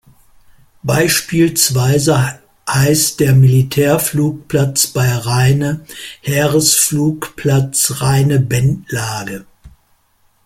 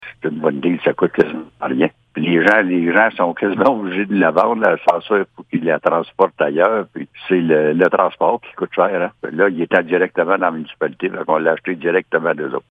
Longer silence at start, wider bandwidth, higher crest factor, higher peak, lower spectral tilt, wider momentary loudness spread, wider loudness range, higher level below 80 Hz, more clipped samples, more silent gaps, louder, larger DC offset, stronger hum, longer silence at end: first, 0.85 s vs 0 s; first, 16.5 kHz vs 8 kHz; about the same, 14 dB vs 16 dB; about the same, 0 dBFS vs 0 dBFS; second, -4.5 dB/octave vs -7.5 dB/octave; about the same, 10 LU vs 9 LU; about the same, 2 LU vs 3 LU; first, -44 dBFS vs -64 dBFS; neither; neither; first, -13 LUFS vs -17 LUFS; neither; neither; first, 0.8 s vs 0.1 s